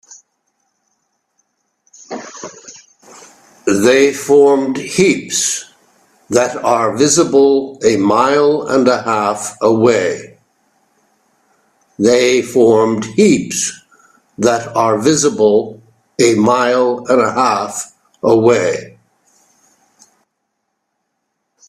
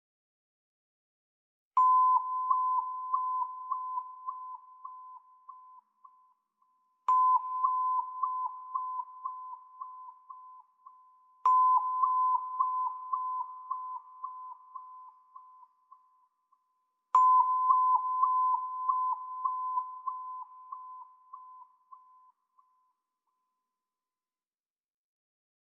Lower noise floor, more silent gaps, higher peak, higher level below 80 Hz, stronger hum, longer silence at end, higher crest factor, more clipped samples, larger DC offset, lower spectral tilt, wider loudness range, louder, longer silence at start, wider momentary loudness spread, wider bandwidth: second, -71 dBFS vs under -90 dBFS; neither; first, 0 dBFS vs -12 dBFS; first, -56 dBFS vs under -90 dBFS; neither; second, 2.8 s vs 4 s; second, 14 dB vs 20 dB; neither; neither; first, -4 dB/octave vs 4 dB/octave; second, 5 LU vs 15 LU; first, -13 LUFS vs -29 LUFS; second, 0.1 s vs 1.75 s; second, 12 LU vs 23 LU; first, 14 kHz vs 7.2 kHz